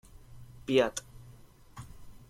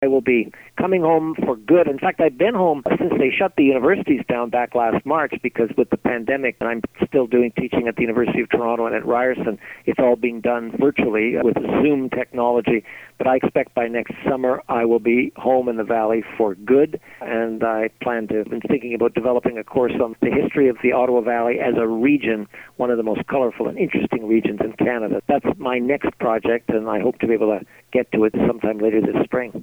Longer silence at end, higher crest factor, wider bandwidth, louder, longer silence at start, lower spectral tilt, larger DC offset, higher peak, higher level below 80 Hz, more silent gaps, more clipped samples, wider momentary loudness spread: first, 0.15 s vs 0 s; first, 22 dB vs 16 dB; second, 15.5 kHz vs 18 kHz; second, -30 LUFS vs -20 LUFS; first, 0.15 s vs 0 s; second, -4.5 dB/octave vs -8 dB/octave; neither; second, -14 dBFS vs -2 dBFS; about the same, -56 dBFS vs -52 dBFS; neither; neither; first, 26 LU vs 6 LU